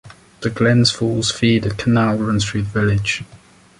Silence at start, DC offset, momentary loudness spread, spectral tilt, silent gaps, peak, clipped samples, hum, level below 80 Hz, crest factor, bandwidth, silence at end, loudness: 0.05 s; under 0.1%; 8 LU; -5 dB/octave; none; -2 dBFS; under 0.1%; none; -40 dBFS; 16 dB; 11.5 kHz; 0.45 s; -18 LUFS